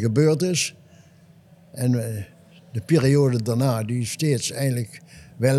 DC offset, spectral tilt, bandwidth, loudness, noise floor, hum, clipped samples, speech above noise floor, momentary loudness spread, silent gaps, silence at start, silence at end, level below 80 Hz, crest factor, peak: under 0.1%; -5.5 dB/octave; 14.5 kHz; -22 LUFS; -52 dBFS; none; under 0.1%; 30 dB; 16 LU; none; 0 s; 0 s; -62 dBFS; 16 dB; -6 dBFS